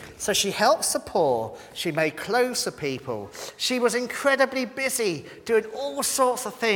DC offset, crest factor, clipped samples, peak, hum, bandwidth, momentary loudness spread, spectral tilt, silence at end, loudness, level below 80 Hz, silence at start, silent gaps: under 0.1%; 20 dB; under 0.1%; -6 dBFS; none; 19 kHz; 10 LU; -2.5 dB/octave; 0 s; -24 LUFS; -60 dBFS; 0 s; none